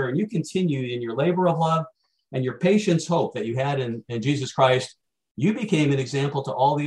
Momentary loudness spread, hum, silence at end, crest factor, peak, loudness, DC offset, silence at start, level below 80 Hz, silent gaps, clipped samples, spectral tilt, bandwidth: 8 LU; none; 0 s; 18 dB; -6 dBFS; -24 LUFS; under 0.1%; 0 s; -64 dBFS; 5.31-5.35 s; under 0.1%; -6.5 dB/octave; 11.5 kHz